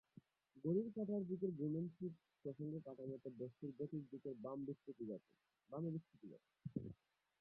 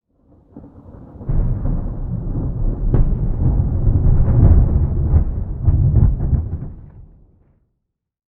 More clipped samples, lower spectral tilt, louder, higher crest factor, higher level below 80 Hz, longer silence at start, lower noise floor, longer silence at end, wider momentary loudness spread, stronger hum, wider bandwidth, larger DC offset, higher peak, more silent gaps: neither; second, -12.5 dB/octave vs -14.5 dB/octave; second, -48 LUFS vs -18 LUFS; about the same, 18 dB vs 16 dB; second, -82 dBFS vs -20 dBFS; about the same, 0.55 s vs 0.55 s; second, -69 dBFS vs -76 dBFS; second, 0.45 s vs 1.35 s; about the same, 12 LU vs 12 LU; neither; first, 4.4 kHz vs 2.1 kHz; neither; second, -30 dBFS vs 0 dBFS; neither